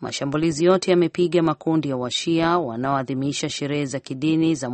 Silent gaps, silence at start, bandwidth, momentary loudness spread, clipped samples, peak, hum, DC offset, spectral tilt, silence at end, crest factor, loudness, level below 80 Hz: none; 0 s; 8.8 kHz; 7 LU; under 0.1%; -6 dBFS; none; under 0.1%; -5.5 dB/octave; 0 s; 16 dB; -22 LUFS; -58 dBFS